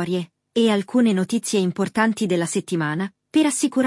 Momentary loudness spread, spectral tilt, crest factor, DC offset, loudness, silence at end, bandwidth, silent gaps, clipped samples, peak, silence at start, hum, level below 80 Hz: 7 LU; -5 dB/octave; 16 dB; under 0.1%; -21 LUFS; 0 s; 12 kHz; none; under 0.1%; -6 dBFS; 0 s; none; -68 dBFS